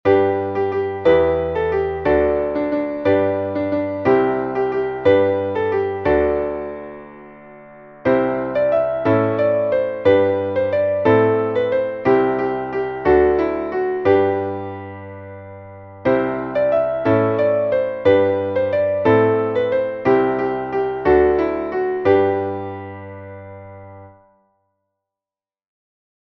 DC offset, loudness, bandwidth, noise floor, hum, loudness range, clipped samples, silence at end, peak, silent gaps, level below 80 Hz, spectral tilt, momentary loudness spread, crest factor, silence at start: under 0.1%; -18 LUFS; 5.8 kHz; under -90 dBFS; none; 4 LU; under 0.1%; 2.25 s; -2 dBFS; none; -44 dBFS; -9 dB/octave; 15 LU; 16 dB; 0.05 s